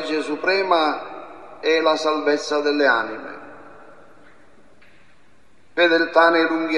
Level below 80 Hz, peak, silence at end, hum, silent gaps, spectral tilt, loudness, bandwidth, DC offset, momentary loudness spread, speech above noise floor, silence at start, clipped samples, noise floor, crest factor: -68 dBFS; -2 dBFS; 0 s; none; none; -3 dB/octave; -19 LUFS; 10.5 kHz; 0.5%; 20 LU; 38 dB; 0 s; under 0.1%; -57 dBFS; 20 dB